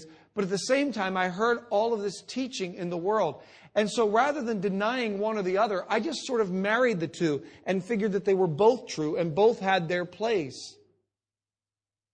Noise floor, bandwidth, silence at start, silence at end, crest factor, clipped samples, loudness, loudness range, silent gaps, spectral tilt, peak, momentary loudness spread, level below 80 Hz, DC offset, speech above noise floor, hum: under -90 dBFS; 10 kHz; 0 s; 1.4 s; 18 dB; under 0.1%; -27 LUFS; 2 LU; none; -5 dB/octave; -10 dBFS; 9 LU; -70 dBFS; under 0.1%; over 63 dB; none